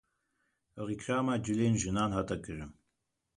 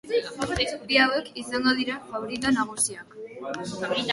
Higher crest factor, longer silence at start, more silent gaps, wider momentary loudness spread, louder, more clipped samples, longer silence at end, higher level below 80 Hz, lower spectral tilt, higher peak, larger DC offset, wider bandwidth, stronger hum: second, 16 dB vs 22 dB; first, 0.75 s vs 0.05 s; neither; about the same, 14 LU vs 14 LU; second, -33 LUFS vs -26 LUFS; neither; first, 0.65 s vs 0 s; about the same, -54 dBFS vs -52 dBFS; first, -5.5 dB/octave vs -2.5 dB/octave; second, -18 dBFS vs -6 dBFS; neither; about the same, 11 kHz vs 12 kHz; neither